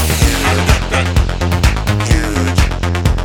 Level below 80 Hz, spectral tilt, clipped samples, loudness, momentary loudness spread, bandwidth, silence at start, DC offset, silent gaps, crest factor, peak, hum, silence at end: -16 dBFS; -4.5 dB/octave; under 0.1%; -14 LUFS; 3 LU; 18.5 kHz; 0 s; under 0.1%; none; 12 dB; 0 dBFS; none; 0 s